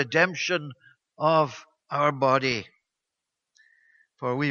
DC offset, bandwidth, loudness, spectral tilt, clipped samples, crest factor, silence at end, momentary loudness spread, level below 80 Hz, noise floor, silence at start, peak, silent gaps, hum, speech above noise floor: under 0.1%; 7.2 kHz; -25 LUFS; -5 dB/octave; under 0.1%; 22 dB; 0 s; 11 LU; -68 dBFS; -85 dBFS; 0 s; -6 dBFS; none; none; 61 dB